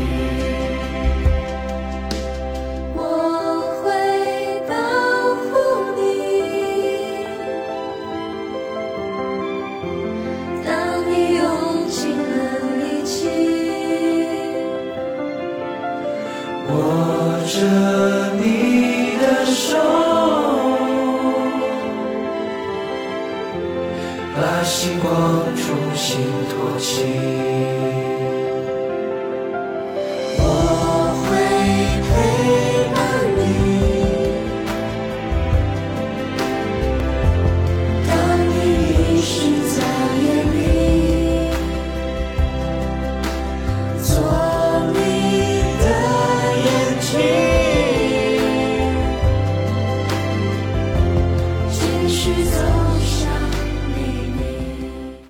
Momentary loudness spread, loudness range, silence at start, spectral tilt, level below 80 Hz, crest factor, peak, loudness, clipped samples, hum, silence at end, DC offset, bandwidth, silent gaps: 9 LU; 5 LU; 0 s; -5.5 dB/octave; -28 dBFS; 12 dB; -6 dBFS; -19 LUFS; under 0.1%; none; 0 s; under 0.1%; 17 kHz; none